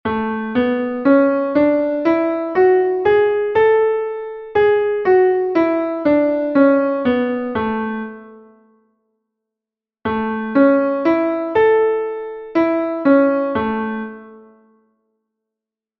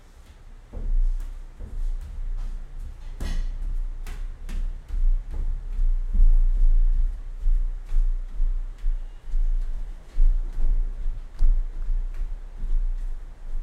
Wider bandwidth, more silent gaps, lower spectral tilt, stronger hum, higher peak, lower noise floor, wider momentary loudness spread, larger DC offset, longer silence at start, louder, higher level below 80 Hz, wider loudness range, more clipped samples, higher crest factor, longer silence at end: first, 5.8 kHz vs 2.2 kHz; neither; first, -8.5 dB/octave vs -6.5 dB/octave; neither; first, -2 dBFS vs -8 dBFS; first, -87 dBFS vs -46 dBFS; second, 9 LU vs 14 LU; neither; second, 0.05 s vs 0.4 s; first, -16 LUFS vs -31 LUFS; second, -54 dBFS vs -22 dBFS; about the same, 6 LU vs 8 LU; neither; about the same, 16 dB vs 14 dB; first, 1.6 s vs 0 s